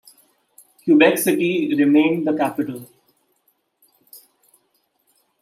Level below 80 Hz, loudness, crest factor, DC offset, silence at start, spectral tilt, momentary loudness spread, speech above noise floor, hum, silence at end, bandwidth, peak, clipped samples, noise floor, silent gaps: -72 dBFS; -18 LUFS; 18 dB; under 0.1%; 0.85 s; -5 dB/octave; 14 LU; 50 dB; none; 1.25 s; 15.5 kHz; -2 dBFS; under 0.1%; -67 dBFS; none